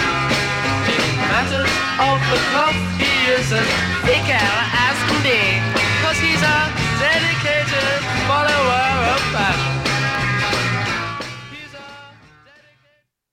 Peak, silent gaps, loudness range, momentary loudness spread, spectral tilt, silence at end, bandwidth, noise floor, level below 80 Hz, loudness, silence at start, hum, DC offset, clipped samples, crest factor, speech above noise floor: -4 dBFS; none; 5 LU; 4 LU; -4 dB/octave; 1.2 s; 16.5 kHz; -62 dBFS; -40 dBFS; -17 LUFS; 0 s; none; under 0.1%; under 0.1%; 16 dB; 45 dB